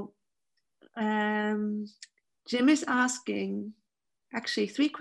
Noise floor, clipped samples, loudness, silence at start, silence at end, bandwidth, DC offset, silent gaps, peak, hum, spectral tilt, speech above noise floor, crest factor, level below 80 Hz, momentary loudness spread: -87 dBFS; under 0.1%; -29 LUFS; 0 s; 0 s; 12 kHz; under 0.1%; none; -12 dBFS; none; -4 dB/octave; 58 dB; 18 dB; -80 dBFS; 17 LU